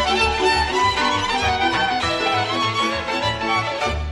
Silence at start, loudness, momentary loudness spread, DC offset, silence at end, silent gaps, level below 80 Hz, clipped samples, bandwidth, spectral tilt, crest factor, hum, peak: 0 s; -19 LUFS; 4 LU; under 0.1%; 0 s; none; -36 dBFS; under 0.1%; 12.5 kHz; -3.5 dB/octave; 16 dB; none; -4 dBFS